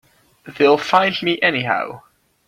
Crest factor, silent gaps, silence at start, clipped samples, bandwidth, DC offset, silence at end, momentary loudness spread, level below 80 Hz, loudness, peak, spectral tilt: 18 dB; none; 0.45 s; under 0.1%; 14.5 kHz; under 0.1%; 0.5 s; 7 LU; -62 dBFS; -17 LUFS; -2 dBFS; -5 dB/octave